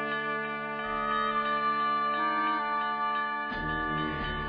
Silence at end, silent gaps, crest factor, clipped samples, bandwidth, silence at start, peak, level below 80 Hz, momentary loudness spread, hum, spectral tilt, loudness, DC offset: 0 s; none; 12 dB; under 0.1%; 5.2 kHz; 0 s; -18 dBFS; -50 dBFS; 4 LU; none; -7.5 dB/octave; -29 LUFS; under 0.1%